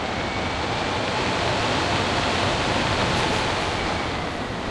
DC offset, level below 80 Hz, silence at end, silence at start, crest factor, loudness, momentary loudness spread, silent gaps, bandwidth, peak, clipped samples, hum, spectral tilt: under 0.1%; -40 dBFS; 0 s; 0 s; 18 dB; -23 LUFS; 4 LU; none; 12 kHz; -6 dBFS; under 0.1%; none; -4 dB/octave